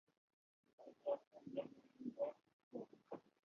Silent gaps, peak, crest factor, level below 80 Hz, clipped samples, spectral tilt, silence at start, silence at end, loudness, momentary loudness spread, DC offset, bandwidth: 1.27-1.31 s, 2.53-2.71 s; -30 dBFS; 20 dB; under -90 dBFS; under 0.1%; -6 dB/octave; 0.8 s; 0.25 s; -50 LUFS; 12 LU; under 0.1%; 6.6 kHz